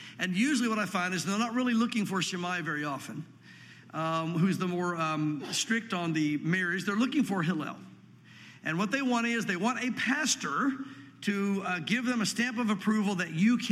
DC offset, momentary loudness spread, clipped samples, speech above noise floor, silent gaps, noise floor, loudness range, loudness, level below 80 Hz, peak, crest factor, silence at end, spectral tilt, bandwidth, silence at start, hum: under 0.1%; 8 LU; under 0.1%; 24 dB; none; -53 dBFS; 2 LU; -30 LUFS; -80 dBFS; -14 dBFS; 16 dB; 0 s; -4.5 dB/octave; 15 kHz; 0 s; none